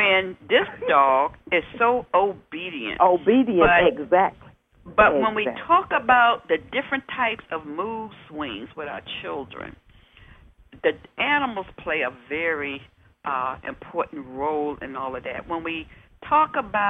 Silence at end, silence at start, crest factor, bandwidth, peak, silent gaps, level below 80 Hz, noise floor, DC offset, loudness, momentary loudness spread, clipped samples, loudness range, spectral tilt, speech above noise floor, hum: 0 s; 0 s; 20 dB; 3.9 kHz; -4 dBFS; none; -50 dBFS; -51 dBFS; under 0.1%; -22 LUFS; 15 LU; under 0.1%; 10 LU; -7 dB/octave; 28 dB; none